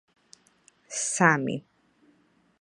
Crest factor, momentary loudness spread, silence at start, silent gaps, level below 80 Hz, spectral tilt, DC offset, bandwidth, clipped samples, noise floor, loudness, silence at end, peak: 26 dB; 14 LU; 0.9 s; none; -76 dBFS; -4 dB/octave; under 0.1%; 11.5 kHz; under 0.1%; -64 dBFS; -25 LUFS; 1 s; -4 dBFS